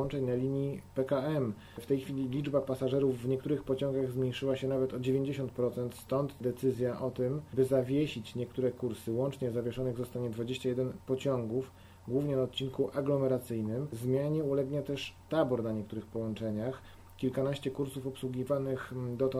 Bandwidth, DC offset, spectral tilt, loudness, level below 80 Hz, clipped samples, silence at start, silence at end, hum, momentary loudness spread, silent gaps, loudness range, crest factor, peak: 15.5 kHz; under 0.1%; -7.5 dB/octave; -34 LUFS; -62 dBFS; under 0.1%; 0 s; 0 s; none; 7 LU; none; 3 LU; 16 dB; -16 dBFS